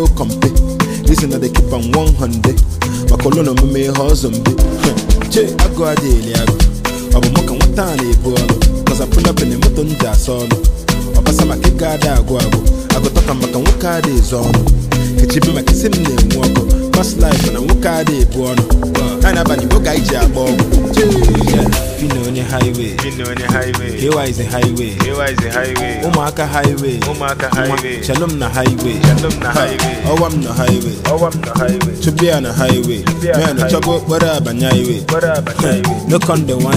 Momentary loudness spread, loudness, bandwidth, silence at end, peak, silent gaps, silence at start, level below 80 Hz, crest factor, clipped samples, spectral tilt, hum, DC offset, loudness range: 4 LU; -14 LUFS; 16 kHz; 0 s; 0 dBFS; none; 0 s; -16 dBFS; 12 dB; under 0.1%; -5.5 dB/octave; none; under 0.1%; 3 LU